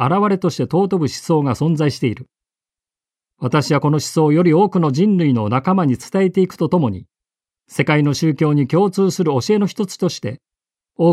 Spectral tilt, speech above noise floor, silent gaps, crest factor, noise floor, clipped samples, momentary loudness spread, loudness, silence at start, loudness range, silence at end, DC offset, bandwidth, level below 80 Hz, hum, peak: -7 dB/octave; over 74 dB; none; 16 dB; under -90 dBFS; under 0.1%; 8 LU; -17 LUFS; 0 s; 4 LU; 0 s; under 0.1%; 14 kHz; -56 dBFS; none; -2 dBFS